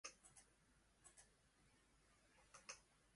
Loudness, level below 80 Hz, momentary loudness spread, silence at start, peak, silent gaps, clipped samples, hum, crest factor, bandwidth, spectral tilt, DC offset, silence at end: -63 LUFS; -82 dBFS; 9 LU; 0.05 s; -40 dBFS; none; under 0.1%; none; 28 dB; 11.5 kHz; -0.5 dB/octave; under 0.1%; 0 s